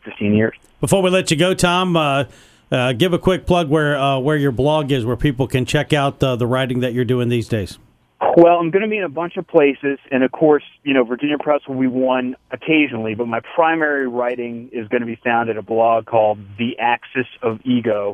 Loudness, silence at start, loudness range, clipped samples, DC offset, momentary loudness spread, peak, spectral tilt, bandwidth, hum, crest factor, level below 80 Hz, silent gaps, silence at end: -18 LUFS; 0.05 s; 3 LU; under 0.1%; under 0.1%; 8 LU; 0 dBFS; -6 dB/octave; 14.5 kHz; none; 18 dB; -42 dBFS; none; 0 s